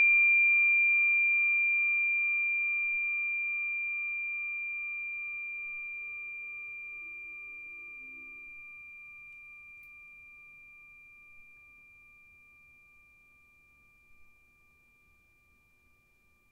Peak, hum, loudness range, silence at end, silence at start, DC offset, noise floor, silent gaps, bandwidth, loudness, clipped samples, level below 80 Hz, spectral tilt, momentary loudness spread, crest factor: -20 dBFS; none; 25 LU; 2.25 s; 0 s; under 0.1%; -67 dBFS; none; 2.7 kHz; -27 LUFS; under 0.1%; -74 dBFS; -3 dB/octave; 25 LU; 14 dB